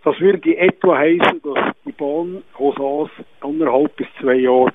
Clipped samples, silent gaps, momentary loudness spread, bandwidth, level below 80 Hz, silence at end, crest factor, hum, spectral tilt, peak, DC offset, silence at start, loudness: under 0.1%; none; 11 LU; 3.9 kHz; -60 dBFS; 0.05 s; 16 dB; none; -8 dB/octave; 0 dBFS; 0.3%; 0.05 s; -17 LUFS